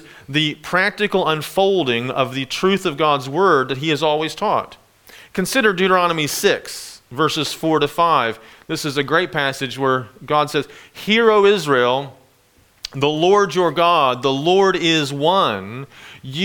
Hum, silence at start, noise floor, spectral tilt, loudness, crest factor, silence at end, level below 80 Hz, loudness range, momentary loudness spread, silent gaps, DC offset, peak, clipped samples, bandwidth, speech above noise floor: none; 0.05 s; -55 dBFS; -4.5 dB/octave; -17 LUFS; 18 dB; 0 s; -56 dBFS; 3 LU; 13 LU; none; under 0.1%; 0 dBFS; under 0.1%; 19 kHz; 37 dB